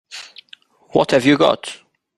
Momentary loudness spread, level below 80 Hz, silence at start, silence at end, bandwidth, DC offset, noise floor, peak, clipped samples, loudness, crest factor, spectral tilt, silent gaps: 23 LU; -56 dBFS; 0.1 s; 0.45 s; 12.5 kHz; under 0.1%; -48 dBFS; 0 dBFS; under 0.1%; -16 LUFS; 18 dB; -5 dB/octave; none